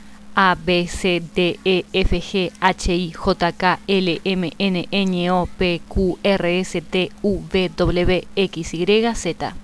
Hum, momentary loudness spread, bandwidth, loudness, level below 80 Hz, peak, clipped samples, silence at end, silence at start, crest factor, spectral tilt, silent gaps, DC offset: none; 5 LU; 11 kHz; -20 LUFS; -32 dBFS; -2 dBFS; under 0.1%; 0 s; 0 s; 18 dB; -5.5 dB/octave; none; under 0.1%